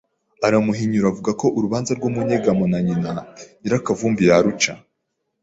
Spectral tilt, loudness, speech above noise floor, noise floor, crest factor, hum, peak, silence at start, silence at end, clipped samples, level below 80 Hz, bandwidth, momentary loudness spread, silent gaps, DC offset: -5.5 dB/octave; -19 LUFS; 56 dB; -75 dBFS; 18 dB; none; -2 dBFS; 0.4 s; 0.65 s; under 0.1%; -52 dBFS; 8 kHz; 8 LU; none; under 0.1%